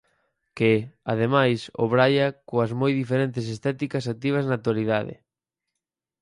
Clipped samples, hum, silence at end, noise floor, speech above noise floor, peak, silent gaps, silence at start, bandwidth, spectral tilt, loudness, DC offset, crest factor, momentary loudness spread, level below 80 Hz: under 0.1%; none; 1.1 s; -86 dBFS; 63 dB; -6 dBFS; none; 0.55 s; 11 kHz; -7 dB/octave; -24 LUFS; under 0.1%; 18 dB; 8 LU; -62 dBFS